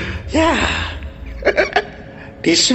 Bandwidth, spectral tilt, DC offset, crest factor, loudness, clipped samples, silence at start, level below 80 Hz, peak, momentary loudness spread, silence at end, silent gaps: 11 kHz; -3 dB/octave; under 0.1%; 16 dB; -17 LUFS; under 0.1%; 0 s; -32 dBFS; -2 dBFS; 18 LU; 0 s; none